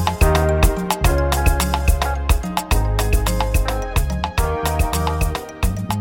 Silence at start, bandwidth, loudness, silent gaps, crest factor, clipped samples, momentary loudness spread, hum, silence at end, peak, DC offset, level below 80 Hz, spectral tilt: 0 s; 17 kHz; -20 LUFS; none; 16 dB; under 0.1%; 5 LU; none; 0 s; 0 dBFS; under 0.1%; -20 dBFS; -5 dB/octave